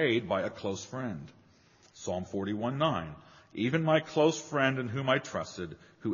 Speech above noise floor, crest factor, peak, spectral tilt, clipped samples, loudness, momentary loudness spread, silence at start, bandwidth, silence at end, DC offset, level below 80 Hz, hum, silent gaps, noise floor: 31 dB; 20 dB; -12 dBFS; -4.5 dB/octave; under 0.1%; -31 LUFS; 15 LU; 0 s; 7.2 kHz; 0 s; under 0.1%; -66 dBFS; none; none; -62 dBFS